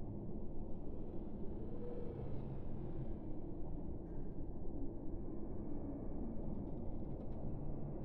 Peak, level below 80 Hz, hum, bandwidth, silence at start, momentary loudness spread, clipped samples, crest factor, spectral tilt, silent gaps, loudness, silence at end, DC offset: -30 dBFS; -48 dBFS; none; 2.3 kHz; 0 s; 3 LU; under 0.1%; 12 dB; -11.5 dB/octave; none; -48 LUFS; 0 s; under 0.1%